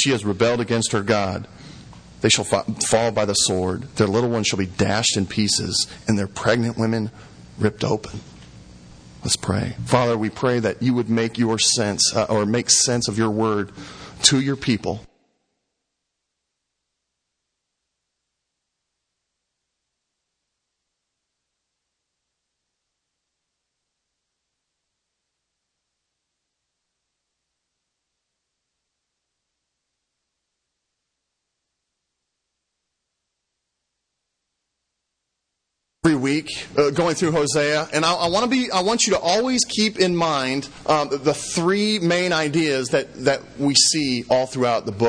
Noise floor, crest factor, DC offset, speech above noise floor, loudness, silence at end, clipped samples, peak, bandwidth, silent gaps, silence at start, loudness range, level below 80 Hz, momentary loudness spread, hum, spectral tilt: -80 dBFS; 24 dB; under 0.1%; 59 dB; -20 LUFS; 0 s; under 0.1%; 0 dBFS; 10.5 kHz; none; 0 s; 6 LU; -54 dBFS; 8 LU; none; -3.5 dB/octave